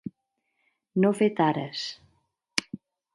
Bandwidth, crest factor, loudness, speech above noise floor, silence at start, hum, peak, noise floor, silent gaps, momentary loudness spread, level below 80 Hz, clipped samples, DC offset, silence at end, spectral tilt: 11.5 kHz; 26 dB; -27 LUFS; 53 dB; 0.05 s; none; -2 dBFS; -78 dBFS; none; 21 LU; -72 dBFS; under 0.1%; under 0.1%; 0.4 s; -5 dB/octave